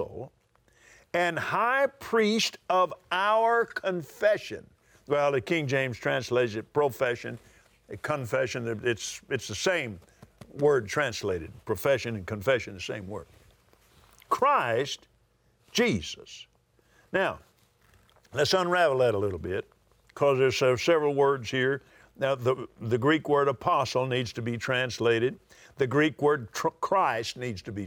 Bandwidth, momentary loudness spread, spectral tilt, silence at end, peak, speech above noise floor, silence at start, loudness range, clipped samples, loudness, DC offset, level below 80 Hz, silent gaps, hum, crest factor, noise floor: over 20 kHz; 12 LU; -4.5 dB/octave; 0 s; -12 dBFS; 40 dB; 0 s; 5 LU; under 0.1%; -27 LUFS; under 0.1%; -64 dBFS; none; none; 16 dB; -67 dBFS